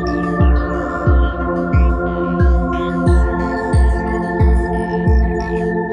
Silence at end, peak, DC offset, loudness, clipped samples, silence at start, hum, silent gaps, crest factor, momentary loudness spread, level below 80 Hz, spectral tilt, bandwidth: 0 s; -2 dBFS; under 0.1%; -17 LUFS; under 0.1%; 0 s; none; none; 12 dB; 4 LU; -18 dBFS; -8.5 dB/octave; 9.4 kHz